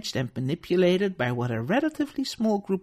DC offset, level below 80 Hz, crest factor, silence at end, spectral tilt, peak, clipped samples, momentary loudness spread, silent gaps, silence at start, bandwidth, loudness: under 0.1%; -60 dBFS; 14 dB; 0 s; -6 dB/octave; -12 dBFS; under 0.1%; 7 LU; none; 0 s; 14.5 kHz; -26 LUFS